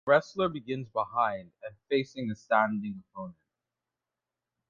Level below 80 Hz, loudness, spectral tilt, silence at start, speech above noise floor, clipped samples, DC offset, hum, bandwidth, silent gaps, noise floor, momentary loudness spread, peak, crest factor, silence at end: -68 dBFS; -30 LUFS; -6.5 dB/octave; 0.05 s; 59 dB; under 0.1%; under 0.1%; none; 7.4 kHz; none; -89 dBFS; 17 LU; -10 dBFS; 22 dB; 1.4 s